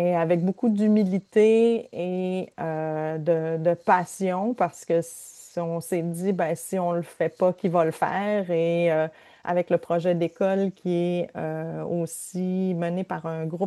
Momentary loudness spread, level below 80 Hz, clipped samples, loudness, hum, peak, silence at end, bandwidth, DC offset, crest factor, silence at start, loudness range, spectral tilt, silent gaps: 9 LU; -72 dBFS; under 0.1%; -25 LUFS; none; -6 dBFS; 0 s; 12.5 kHz; under 0.1%; 18 dB; 0 s; 4 LU; -7 dB/octave; none